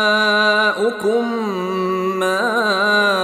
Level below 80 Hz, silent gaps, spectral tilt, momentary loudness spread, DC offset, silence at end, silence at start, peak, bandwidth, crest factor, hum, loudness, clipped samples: -64 dBFS; none; -4 dB/octave; 7 LU; under 0.1%; 0 s; 0 s; -4 dBFS; 15 kHz; 14 dB; none; -17 LUFS; under 0.1%